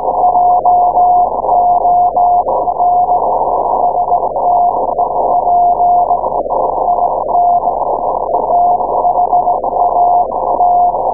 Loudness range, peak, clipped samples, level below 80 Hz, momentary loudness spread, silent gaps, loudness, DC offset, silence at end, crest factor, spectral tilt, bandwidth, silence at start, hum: 2 LU; 0 dBFS; under 0.1%; -40 dBFS; 5 LU; none; -12 LUFS; 1%; 0 s; 10 dB; -16.5 dB/octave; 1.2 kHz; 0 s; 50 Hz at -40 dBFS